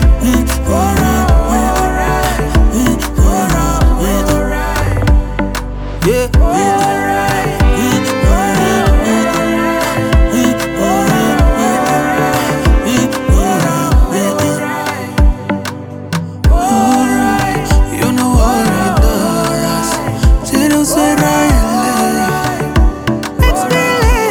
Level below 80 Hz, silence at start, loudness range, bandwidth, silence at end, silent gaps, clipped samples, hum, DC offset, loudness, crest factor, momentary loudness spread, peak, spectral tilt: -16 dBFS; 0 s; 2 LU; 19 kHz; 0 s; none; under 0.1%; none; under 0.1%; -12 LUFS; 10 dB; 4 LU; 0 dBFS; -5.5 dB/octave